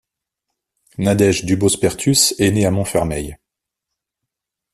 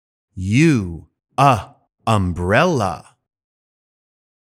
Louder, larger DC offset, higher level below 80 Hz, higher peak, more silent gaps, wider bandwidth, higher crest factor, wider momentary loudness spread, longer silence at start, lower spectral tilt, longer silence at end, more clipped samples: about the same, -16 LUFS vs -18 LUFS; neither; about the same, -44 dBFS vs -46 dBFS; about the same, 0 dBFS vs 0 dBFS; neither; about the same, 14.5 kHz vs 15.5 kHz; about the same, 18 dB vs 20 dB; second, 11 LU vs 15 LU; first, 1 s vs 0.35 s; second, -4.5 dB/octave vs -6.5 dB/octave; about the same, 1.4 s vs 1.5 s; neither